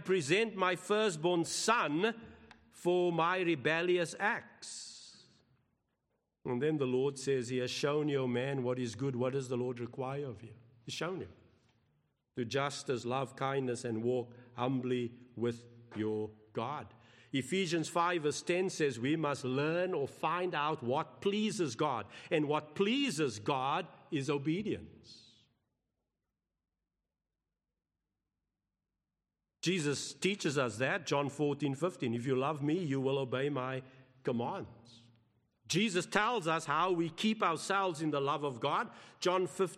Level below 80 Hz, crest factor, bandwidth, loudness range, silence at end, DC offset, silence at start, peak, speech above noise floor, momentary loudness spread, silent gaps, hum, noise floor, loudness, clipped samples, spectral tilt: -78 dBFS; 22 dB; 13 kHz; 7 LU; 0 s; under 0.1%; 0 s; -12 dBFS; over 56 dB; 10 LU; none; none; under -90 dBFS; -34 LUFS; under 0.1%; -5 dB/octave